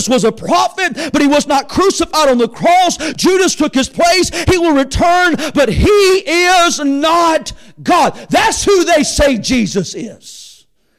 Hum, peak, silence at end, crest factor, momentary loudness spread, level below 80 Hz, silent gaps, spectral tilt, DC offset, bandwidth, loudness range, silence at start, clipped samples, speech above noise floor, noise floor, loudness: none; -4 dBFS; 0.5 s; 8 dB; 6 LU; -30 dBFS; none; -3.5 dB/octave; under 0.1%; 16 kHz; 2 LU; 0 s; under 0.1%; 34 dB; -46 dBFS; -12 LUFS